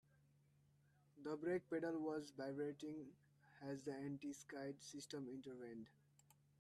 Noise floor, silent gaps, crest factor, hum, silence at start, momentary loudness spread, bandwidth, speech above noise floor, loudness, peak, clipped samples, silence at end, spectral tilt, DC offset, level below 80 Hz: -76 dBFS; none; 16 dB; none; 1.15 s; 11 LU; 13 kHz; 27 dB; -50 LUFS; -34 dBFS; under 0.1%; 0.7 s; -5.5 dB/octave; under 0.1%; -88 dBFS